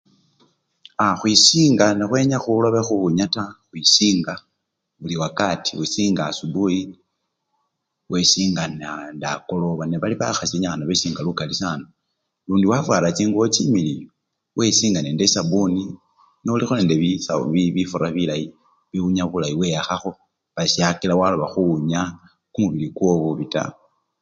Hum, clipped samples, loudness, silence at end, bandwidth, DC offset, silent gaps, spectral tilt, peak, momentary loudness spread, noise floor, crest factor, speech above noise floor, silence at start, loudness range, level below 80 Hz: none; under 0.1%; -19 LUFS; 0.5 s; 9.4 kHz; under 0.1%; none; -4 dB/octave; 0 dBFS; 13 LU; -77 dBFS; 20 dB; 57 dB; 1 s; 6 LU; -52 dBFS